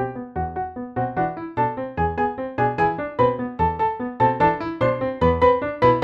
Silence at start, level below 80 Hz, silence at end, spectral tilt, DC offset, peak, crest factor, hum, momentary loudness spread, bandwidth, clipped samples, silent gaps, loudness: 0 s; -40 dBFS; 0 s; -9 dB/octave; under 0.1%; -4 dBFS; 18 dB; none; 9 LU; 6.6 kHz; under 0.1%; none; -22 LUFS